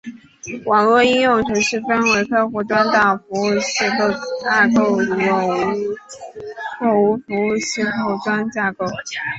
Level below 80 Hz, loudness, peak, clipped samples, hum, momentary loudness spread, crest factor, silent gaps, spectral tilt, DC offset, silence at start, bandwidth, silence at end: -56 dBFS; -17 LUFS; -2 dBFS; under 0.1%; none; 14 LU; 16 dB; none; -4 dB/octave; under 0.1%; 0.05 s; 8.2 kHz; 0 s